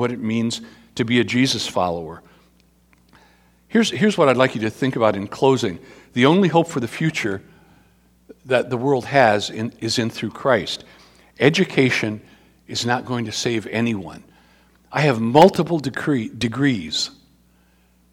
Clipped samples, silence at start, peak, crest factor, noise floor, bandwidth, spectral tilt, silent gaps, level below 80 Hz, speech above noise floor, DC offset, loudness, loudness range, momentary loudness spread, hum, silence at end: under 0.1%; 0 s; 0 dBFS; 20 dB; -57 dBFS; 18 kHz; -5 dB/octave; none; -56 dBFS; 38 dB; under 0.1%; -20 LUFS; 4 LU; 12 LU; none; 1 s